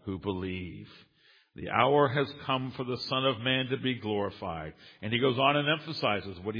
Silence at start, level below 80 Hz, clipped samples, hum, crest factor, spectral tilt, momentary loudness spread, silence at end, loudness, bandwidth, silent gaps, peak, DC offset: 0.05 s; -62 dBFS; under 0.1%; none; 22 dB; -7 dB/octave; 15 LU; 0 s; -29 LUFS; 5.2 kHz; none; -8 dBFS; under 0.1%